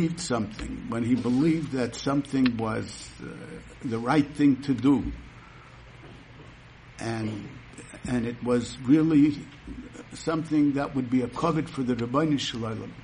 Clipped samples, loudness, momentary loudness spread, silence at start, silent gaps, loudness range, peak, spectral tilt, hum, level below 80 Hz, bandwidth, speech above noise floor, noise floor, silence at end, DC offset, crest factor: under 0.1%; -26 LUFS; 19 LU; 0 s; none; 7 LU; -10 dBFS; -6.5 dB/octave; none; -50 dBFS; 10.5 kHz; 22 dB; -48 dBFS; 0 s; under 0.1%; 18 dB